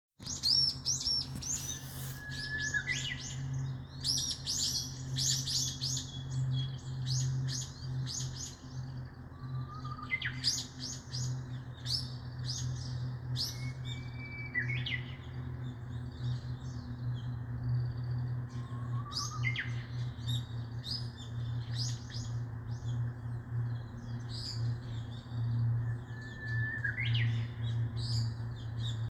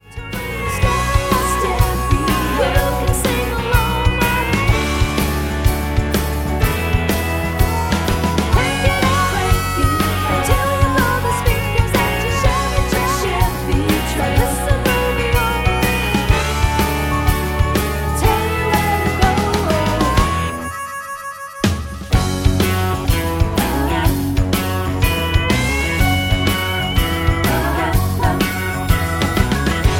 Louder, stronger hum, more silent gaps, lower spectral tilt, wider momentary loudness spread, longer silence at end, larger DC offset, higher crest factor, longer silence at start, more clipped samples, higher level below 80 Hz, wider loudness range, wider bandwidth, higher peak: second, -36 LUFS vs -17 LUFS; neither; neither; second, -3 dB/octave vs -5 dB/octave; first, 10 LU vs 3 LU; about the same, 0 s vs 0 s; neither; about the same, 20 dB vs 16 dB; about the same, 0.2 s vs 0.1 s; neither; second, -54 dBFS vs -22 dBFS; first, 6 LU vs 2 LU; about the same, 17.5 kHz vs 17 kHz; second, -18 dBFS vs 0 dBFS